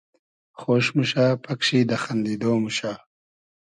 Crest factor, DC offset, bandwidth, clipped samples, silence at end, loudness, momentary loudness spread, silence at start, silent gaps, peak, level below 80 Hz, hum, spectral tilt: 16 dB; under 0.1%; 10.5 kHz; under 0.1%; 0.65 s; -23 LUFS; 10 LU; 0.6 s; none; -8 dBFS; -64 dBFS; none; -5.5 dB/octave